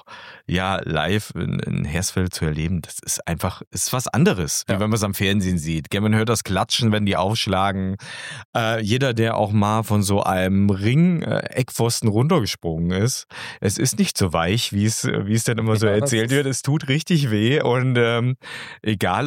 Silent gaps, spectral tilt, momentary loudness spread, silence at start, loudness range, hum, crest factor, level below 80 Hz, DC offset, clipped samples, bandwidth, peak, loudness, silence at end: 3.67-3.71 s, 8.45-8.53 s; -5 dB/octave; 7 LU; 0.1 s; 3 LU; none; 14 dB; -46 dBFS; under 0.1%; under 0.1%; 17 kHz; -6 dBFS; -21 LUFS; 0 s